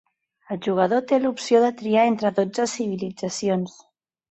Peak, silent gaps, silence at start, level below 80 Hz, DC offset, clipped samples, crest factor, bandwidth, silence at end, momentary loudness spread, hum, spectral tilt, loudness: -6 dBFS; none; 0.5 s; -68 dBFS; under 0.1%; under 0.1%; 18 dB; 8.2 kHz; 0.6 s; 9 LU; none; -5 dB/octave; -22 LUFS